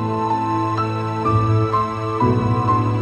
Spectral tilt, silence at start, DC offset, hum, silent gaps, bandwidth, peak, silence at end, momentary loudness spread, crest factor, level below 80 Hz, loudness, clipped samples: -8.5 dB/octave; 0 s; under 0.1%; none; none; 8.2 kHz; -6 dBFS; 0 s; 4 LU; 14 dB; -42 dBFS; -19 LUFS; under 0.1%